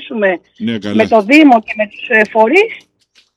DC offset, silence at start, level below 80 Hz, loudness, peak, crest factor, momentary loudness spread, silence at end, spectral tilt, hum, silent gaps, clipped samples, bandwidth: under 0.1%; 0 s; -60 dBFS; -11 LUFS; 0 dBFS; 12 dB; 13 LU; 0.6 s; -5.5 dB/octave; none; none; under 0.1%; 11.5 kHz